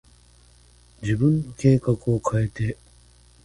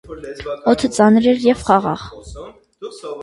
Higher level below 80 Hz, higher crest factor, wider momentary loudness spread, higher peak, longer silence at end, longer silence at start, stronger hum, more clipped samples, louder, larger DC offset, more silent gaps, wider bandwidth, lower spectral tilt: about the same, -46 dBFS vs -44 dBFS; about the same, 18 dB vs 18 dB; second, 10 LU vs 22 LU; second, -6 dBFS vs 0 dBFS; first, 0.7 s vs 0 s; first, 1 s vs 0.1 s; first, 60 Hz at -40 dBFS vs none; neither; second, -23 LUFS vs -15 LUFS; neither; neither; about the same, 11.5 kHz vs 11.5 kHz; first, -8 dB/octave vs -5.5 dB/octave